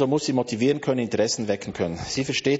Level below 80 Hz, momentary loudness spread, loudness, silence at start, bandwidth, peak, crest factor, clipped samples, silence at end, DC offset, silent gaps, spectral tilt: -54 dBFS; 6 LU; -24 LUFS; 0 s; 8 kHz; -8 dBFS; 16 dB; under 0.1%; 0 s; under 0.1%; none; -4.5 dB/octave